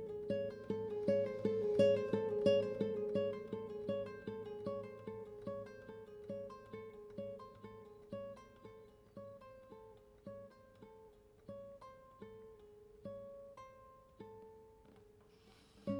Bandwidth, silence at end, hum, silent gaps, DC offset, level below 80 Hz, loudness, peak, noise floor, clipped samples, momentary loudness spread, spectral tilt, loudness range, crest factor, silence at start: 10 kHz; 0 s; none; none; under 0.1%; -72 dBFS; -40 LUFS; -20 dBFS; -65 dBFS; under 0.1%; 24 LU; -7.5 dB/octave; 20 LU; 22 dB; 0 s